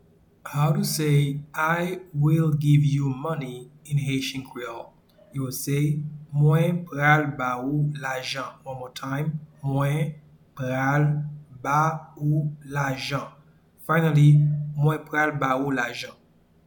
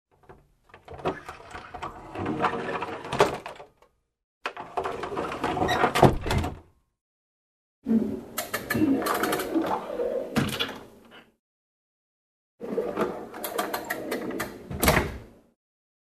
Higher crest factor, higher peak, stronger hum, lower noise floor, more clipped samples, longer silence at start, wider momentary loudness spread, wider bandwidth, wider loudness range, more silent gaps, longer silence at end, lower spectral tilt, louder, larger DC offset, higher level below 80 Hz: second, 18 dB vs 28 dB; second, -6 dBFS vs -2 dBFS; neither; second, -52 dBFS vs -64 dBFS; neither; first, 0.45 s vs 0.3 s; about the same, 15 LU vs 16 LU; first, 19 kHz vs 14 kHz; about the same, 5 LU vs 7 LU; second, none vs 4.24-4.41 s, 7.01-7.82 s, 11.39-12.58 s; second, 0.55 s vs 0.85 s; first, -6.5 dB/octave vs -5 dB/octave; first, -24 LUFS vs -28 LUFS; neither; second, -58 dBFS vs -46 dBFS